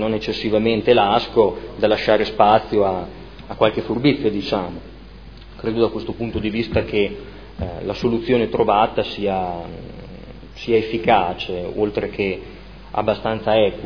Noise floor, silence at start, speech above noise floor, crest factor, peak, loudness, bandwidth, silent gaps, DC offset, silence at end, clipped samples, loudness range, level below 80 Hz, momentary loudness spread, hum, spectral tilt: -39 dBFS; 0 s; 20 dB; 20 dB; 0 dBFS; -20 LUFS; 5.4 kHz; none; 0.4%; 0 s; under 0.1%; 5 LU; -40 dBFS; 19 LU; none; -7.5 dB/octave